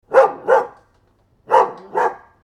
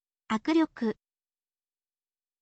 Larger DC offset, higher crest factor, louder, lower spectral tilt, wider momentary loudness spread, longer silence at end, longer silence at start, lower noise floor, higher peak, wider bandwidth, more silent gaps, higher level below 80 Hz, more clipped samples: neither; about the same, 18 dB vs 18 dB; first, -17 LUFS vs -29 LUFS; about the same, -4.5 dB/octave vs -5.5 dB/octave; about the same, 7 LU vs 9 LU; second, 0.3 s vs 1.5 s; second, 0.1 s vs 0.3 s; second, -58 dBFS vs under -90 dBFS; first, 0 dBFS vs -16 dBFS; first, 9.8 kHz vs 8.2 kHz; neither; first, -64 dBFS vs -70 dBFS; neither